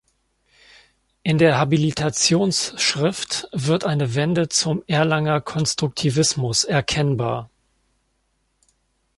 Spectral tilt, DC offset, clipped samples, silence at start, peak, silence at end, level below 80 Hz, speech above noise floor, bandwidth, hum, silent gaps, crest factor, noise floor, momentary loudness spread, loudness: -4 dB/octave; under 0.1%; under 0.1%; 1.25 s; -2 dBFS; 1.7 s; -52 dBFS; 49 dB; 11.5 kHz; none; none; 18 dB; -69 dBFS; 7 LU; -20 LUFS